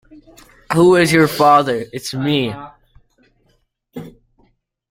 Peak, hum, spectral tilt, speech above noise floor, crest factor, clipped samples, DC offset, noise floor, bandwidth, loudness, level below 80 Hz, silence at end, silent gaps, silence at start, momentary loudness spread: 0 dBFS; none; -5.5 dB/octave; 48 dB; 16 dB; under 0.1%; under 0.1%; -62 dBFS; 16.5 kHz; -14 LUFS; -52 dBFS; 0.85 s; none; 0.7 s; 23 LU